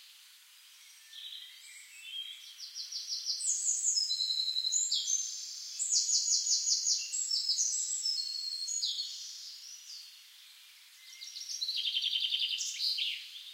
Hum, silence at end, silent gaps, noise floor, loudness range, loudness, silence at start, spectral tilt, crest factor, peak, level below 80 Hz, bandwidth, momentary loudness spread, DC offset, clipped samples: none; 0 s; none; -58 dBFS; 10 LU; -31 LUFS; 0 s; 12.5 dB/octave; 20 dB; -16 dBFS; under -90 dBFS; 16 kHz; 19 LU; under 0.1%; under 0.1%